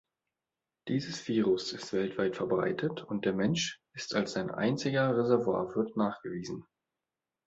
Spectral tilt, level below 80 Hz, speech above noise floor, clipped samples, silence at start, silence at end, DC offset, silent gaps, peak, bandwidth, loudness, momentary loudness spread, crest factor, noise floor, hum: -5.5 dB/octave; -68 dBFS; over 59 dB; under 0.1%; 0.85 s; 0.85 s; under 0.1%; none; -12 dBFS; 8 kHz; -32 LUFS; 11 LU; 20 dB; under -90 dBFS; none